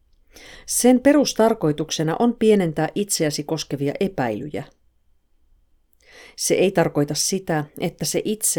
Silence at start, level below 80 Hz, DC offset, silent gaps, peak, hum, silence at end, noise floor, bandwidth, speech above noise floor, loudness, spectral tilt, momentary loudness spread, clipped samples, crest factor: 0.4 s; -54 dBFS; under 0.1%; none; -4 dBFS; none; 0 s; -60 dBFS; over 20 kHz; 40 dB; -20 LUFS; -4 dB/octave; 9 LU; under 0.1%; 18 dB